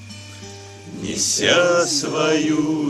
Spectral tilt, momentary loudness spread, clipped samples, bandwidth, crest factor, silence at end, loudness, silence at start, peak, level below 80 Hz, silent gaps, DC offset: -3 dB/octave; 21 LU; under 0.1%; 14 kHz; 18 dB; 0 s; -18 LUFS; 0 s; -2 dBFS; -56 dBFS; none; under 0.1%